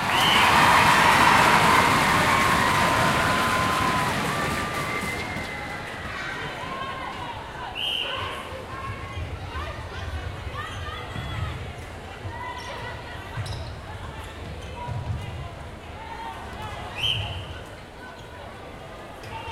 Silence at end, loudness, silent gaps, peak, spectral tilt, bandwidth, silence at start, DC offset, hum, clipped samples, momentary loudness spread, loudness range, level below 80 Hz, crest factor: 0 s; -23 LUFS; none; -4 dBFS; -3.5 dB/octave; 16 kHz; 0 s; under 0.1%; none; under 0.1%; 21 LU; 16 LU; -42 dBFS; 20 dB